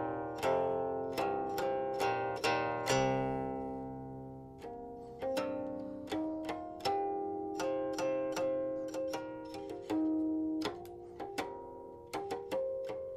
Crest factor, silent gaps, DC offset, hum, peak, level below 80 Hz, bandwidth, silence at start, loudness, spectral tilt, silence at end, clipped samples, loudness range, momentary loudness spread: 18 dB; none; under 0.1%; none; -18 dBFS; -64 dBFS; 15.5 kHz; 0 s; -37 LUFS; -5 dB/octave; 0 s; under 0.1%; 5 LU; 13 LU